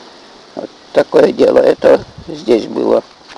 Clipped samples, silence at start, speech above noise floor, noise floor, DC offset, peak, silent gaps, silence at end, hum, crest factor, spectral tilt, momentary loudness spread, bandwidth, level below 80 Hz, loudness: under 0.1%; 0.55 s; 27 dB; -39 dBFS; under 0.1%; 0 dBFS; none; 0.05 s; none; 12 dB; -6 dB/octave; 19 LU; 10.5 kHz; -48 dBFS; -12 LUFS